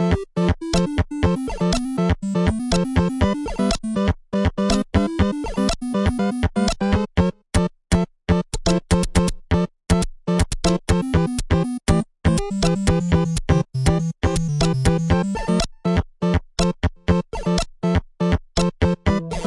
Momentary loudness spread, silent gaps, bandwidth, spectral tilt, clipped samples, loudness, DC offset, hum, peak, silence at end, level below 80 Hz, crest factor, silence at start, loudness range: 3 LU; none; 11.5 kHz; -6 dB/octave; under 0.1%; -21 LUFS; under 0.1%; none; -4 dBFS; 0 s; -30 dBFS; 16 dB; 0 s; 1 LU